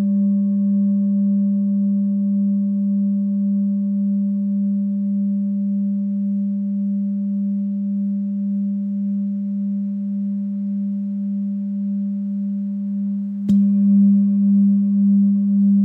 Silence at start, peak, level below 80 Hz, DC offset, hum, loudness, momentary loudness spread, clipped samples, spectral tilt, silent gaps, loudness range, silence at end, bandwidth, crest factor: 0 s; -8 dBFS; -66 dBFS; under 0.1%; none; -20 LUFS; 8 LU; under 0.1%; -13 dB/octave; none; 6 LU; 0 s; 1.2 kHz; 10 dB